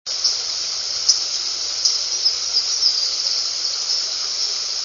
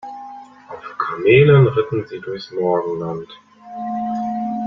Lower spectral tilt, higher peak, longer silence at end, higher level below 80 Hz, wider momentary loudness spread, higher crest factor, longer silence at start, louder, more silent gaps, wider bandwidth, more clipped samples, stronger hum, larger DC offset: second, 3.5 dB/octave vs -9 dB/octave; about the same, 0 dBFS vs -2 dBFS; about the same, 0 s vs 0 s; second, -62 dBFS vs -54 dBFS; second, 5 LU vs 23 LU; about the same, 20 dB vs 18 dB; about the same, 0.05 s vs 0.05 s; about the same, -18 LUFS vs -18 LUFS; neither; first, 7.4 kHz vs 6 kHz; neither; neither; neither